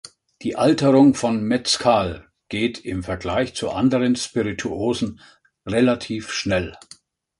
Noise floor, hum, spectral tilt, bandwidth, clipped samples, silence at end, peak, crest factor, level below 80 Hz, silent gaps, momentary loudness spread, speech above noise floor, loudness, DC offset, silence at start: -50 dBFS; none; -5 dB/octave; 11.5 kHz; under 0.1%; 0.65 s; -4 dBFS; 18 dB; -46 dBFS; none; 13 LU; 30 dB; -21 LUFS; under 0.1%; 0.4 s